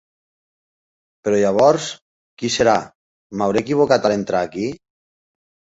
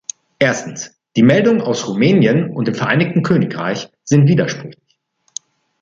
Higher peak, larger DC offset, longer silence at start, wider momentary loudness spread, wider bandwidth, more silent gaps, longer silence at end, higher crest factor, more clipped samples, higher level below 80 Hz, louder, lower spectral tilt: about the same, -2 dBFS vs -2 dBFS; neither; first, 1.25 s vs 0.4 s; second, 14 LU vs 18 LU; about the same, 8 kHz vs 7.6 kHz; first, 2.02-2.37 s, 2.95-3.30 s vs none; about the same, 1.05 s vs 1.1 s; about the same, 18 dB vs 14 dB; neither; about the same, -56 dBFS vs -54 dBFS; second, -18 LUFS vs -15 LUFS; second, -4.5 dB/octave vs -6 dB/octave